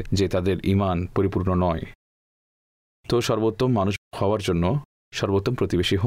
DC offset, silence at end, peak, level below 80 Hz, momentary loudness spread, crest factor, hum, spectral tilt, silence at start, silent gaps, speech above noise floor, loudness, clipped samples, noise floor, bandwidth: under 0.1%; 0 s; -12 dBFS; -46 dBFS; 7 LU; 12 dB; none; -6.5 dB/octave; 0 s; 1.95-3.04 s, 3.98-4.11 s, 4.85-5.11 s; over 68 dB; -24 LUFS; under 0.1%; under -90 dBFS; 15.5 kHz